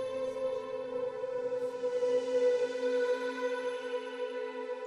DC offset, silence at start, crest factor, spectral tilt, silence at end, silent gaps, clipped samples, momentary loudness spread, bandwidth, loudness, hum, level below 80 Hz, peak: under 0.1%; 0 s; 14 dB; -3.5 dB/octave; 0 s; none; under 0.1%; 8 LU; 11 kHz; -34 LUFS; none; -76 dBFS; -20 dBFS